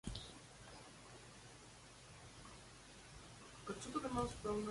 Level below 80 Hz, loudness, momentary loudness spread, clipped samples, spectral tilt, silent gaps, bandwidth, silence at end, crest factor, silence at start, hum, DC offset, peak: -62 dBFS; -50 LUFS; 16 LU; under 0.1%; -4.5 dB/octave; none; 11.5 kHz; 0 s; 24 dB; 0.05 s; none; under 0.1%; -26 dBFS